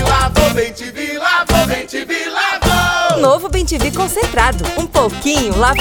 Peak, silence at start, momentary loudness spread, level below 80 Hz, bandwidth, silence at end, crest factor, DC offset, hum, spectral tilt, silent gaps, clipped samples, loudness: 0 dBFS; 0 s; 7 LU; -24 dBFS; over 20 kHz; 0 s; 14 dB; under 0.1%; none; -4 dB/octave; none; under 0.1%; -14 LUFS